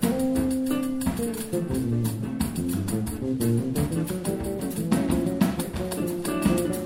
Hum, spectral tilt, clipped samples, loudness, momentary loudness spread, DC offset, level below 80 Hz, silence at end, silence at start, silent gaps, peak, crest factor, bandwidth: none; -6 dB/octave; under 0.1%; -27 LUFS; 5 LU; under 0.1%; -42 dBFS; 0 s; 0 s; none; -8 dBFS; 18 dB; 16.5 kHz